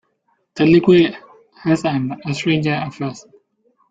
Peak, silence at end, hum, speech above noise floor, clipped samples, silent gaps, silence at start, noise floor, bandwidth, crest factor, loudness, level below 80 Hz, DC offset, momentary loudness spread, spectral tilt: -2 dBFS; 0.7 s; none; 50 dB; under 0.1%; none; 0.55 s; -66 dBFS; 7.8 kHz; 16 dB; -17 LUFS; -54 dBFS; under 0.1%; 16 LU; -7 dB/octave